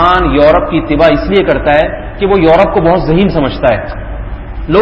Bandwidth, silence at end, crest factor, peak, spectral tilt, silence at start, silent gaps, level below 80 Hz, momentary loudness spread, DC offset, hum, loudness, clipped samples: 8 kHz; 0 s; 10 dB; 0 dBFS; -8.5 dB/octave; 0 s; none; -22 dBFS; 15 LU; under 0.1%; none; -10 LUFS; 0.3%